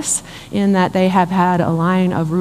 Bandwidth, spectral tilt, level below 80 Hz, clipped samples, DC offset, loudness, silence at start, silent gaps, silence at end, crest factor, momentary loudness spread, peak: 14.5 kHz; -5.5 dB/octave; -48 dBFS; under 0.1%; under 0.1%; -16 LUFS; 0 s; none; 0 s; 14 dB; 5 LU; 0 dBFS